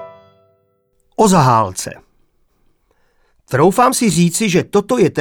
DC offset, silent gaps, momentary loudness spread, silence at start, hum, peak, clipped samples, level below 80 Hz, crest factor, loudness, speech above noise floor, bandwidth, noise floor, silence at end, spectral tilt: under 0.1%; none; 11 LU; 0 s; none; -2 dBFS; under 0.1%; -48 dBFS; 14 dB; -14 LUFS; 48 dB; 19 kHz; -61 dBFS; 0 s; -5 dB/octave